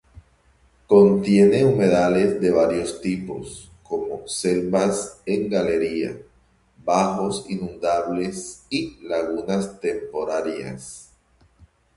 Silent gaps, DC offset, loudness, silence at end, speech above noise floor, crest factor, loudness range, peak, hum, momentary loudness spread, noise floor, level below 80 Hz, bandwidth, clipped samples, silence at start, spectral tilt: none; under 0.1%; -21 LUFS; 0.95 s; 38 dB; 18 dB; 8 LU; -4 dBFS; none; 17 LU; -59 dBFS; -52 dBFS; 11.5 kHz; under 0.1%; 0.9 s; -6 dB/octave